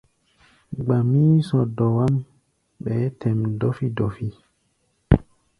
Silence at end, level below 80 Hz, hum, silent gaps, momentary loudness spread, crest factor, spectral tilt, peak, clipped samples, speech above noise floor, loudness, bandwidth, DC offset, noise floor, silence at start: 0.4 s; -38 dBFS; none; none; 12 LU; 22 dB; -10 dB/octave; 0 dBFS; under 0.1%; 47 dB; -22 LUFS; 10.5 kHz; under 0.1%; -68 dBFS; 0.7 s